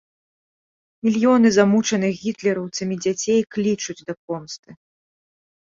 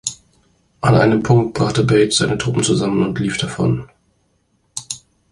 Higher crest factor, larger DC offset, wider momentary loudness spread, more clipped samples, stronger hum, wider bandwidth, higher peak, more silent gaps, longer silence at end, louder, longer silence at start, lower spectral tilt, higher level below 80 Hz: about the same, 18 dB vs 16 dB; neither; about the same, 15 LU vs 14 LU; neither; neither; second, 7.6 kHz vs 11.5 kHz; second, -4 dBFS vs 0 dBFS; first, 4.17-4.28 s, 4.59-4.63 s vs none; first, 0.85 s vs 0.35 s; second, -20 LUFS vs -17 LUFS; first, 1.05 s vs 0.05 s; about the same, -5 dB/octave vs -5 dB/octave; second, -64 dBFS vs -44 dBFS